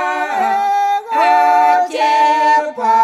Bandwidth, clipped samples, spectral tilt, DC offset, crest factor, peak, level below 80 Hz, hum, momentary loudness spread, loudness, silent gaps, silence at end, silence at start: 12.5 kHz; under 0.1%; -2 dB/octave; under 0.1%; 12 dB; -2 dBFS; -74 dBFS; none; 5 LU; -13 LUFS; none; 0 s; 0 s